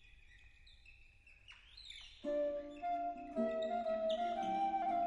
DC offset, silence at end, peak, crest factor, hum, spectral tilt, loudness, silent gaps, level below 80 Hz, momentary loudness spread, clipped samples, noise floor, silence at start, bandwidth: under 0.1%; 0 s; -26 dBFS; 14 dB; none; -5.5 dB/octave; -39 LUFS; none; -66 dBFS; 19 LU; under 0.1%; -63 dBFS; 0.05 s; 11 kHz